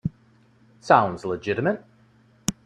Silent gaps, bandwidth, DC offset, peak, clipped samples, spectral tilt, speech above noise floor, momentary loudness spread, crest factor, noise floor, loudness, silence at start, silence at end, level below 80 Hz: none; 13.5 kHz; under 0.1%; -2 dBFS; under 0.1%; -5 dB/octave; 36 dB; 15 LU; 24 dB; -58 dBFS; -24 LUFS; 0.05 s; 0.15 s; -58 dBFS